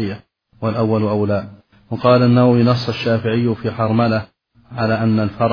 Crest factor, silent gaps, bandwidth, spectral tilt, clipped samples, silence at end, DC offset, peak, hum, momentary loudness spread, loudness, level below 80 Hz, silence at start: 16 dB; none; 5.4 kHz; -9 dB/octave; under 0.1%; 0 s; under 0.1%; 0 dBFS; none; 13 LU; -17 LUFS; -52 dBFS; 0 s